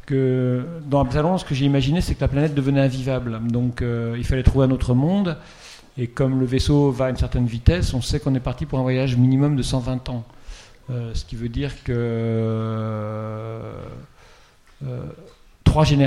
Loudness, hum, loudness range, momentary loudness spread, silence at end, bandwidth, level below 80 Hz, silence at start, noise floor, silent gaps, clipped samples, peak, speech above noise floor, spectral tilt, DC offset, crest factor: -22 LUFS; none; 6 LU; 14 LU; 0 s; 12 kHz; -32 dBFS; 0.05 s; -50 dBFS; none; under 0.1%; -2 dBFS; 30 dB; -7.5 dB/octave; under 0.1%; 20 dB